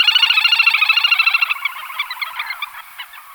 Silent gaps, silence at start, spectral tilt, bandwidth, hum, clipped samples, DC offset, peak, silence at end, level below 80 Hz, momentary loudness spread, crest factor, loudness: none; 0 s; 5 dB/octave; over 20 kHz; none; under 0.1%; under 0.1%; -2 dBFS; 0 s; -66 dBFS; 18 LU; 16 dB; -13 LUFS